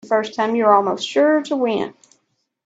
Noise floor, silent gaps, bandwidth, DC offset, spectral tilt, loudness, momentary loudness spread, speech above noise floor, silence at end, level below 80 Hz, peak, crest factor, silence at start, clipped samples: -69 dBFS; none; 8 kHz; under 0.1%; -4.5 dB/octave; -18 LUFS; 7 LU; 51 dB; 0.75 s; -68 dBFS; 0 dBFS; 18 dB; 0.05 s; under 0.1%